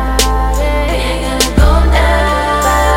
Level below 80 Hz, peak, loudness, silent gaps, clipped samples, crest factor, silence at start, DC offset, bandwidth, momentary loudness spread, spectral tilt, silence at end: -14 dBFS; 0 dBFS; -12 LUFS; none; under 0.1%; 10 dB; 0 s; under 0.1%; 16.5 kHz; 5 LU; -4.5 dB/octave; 0 s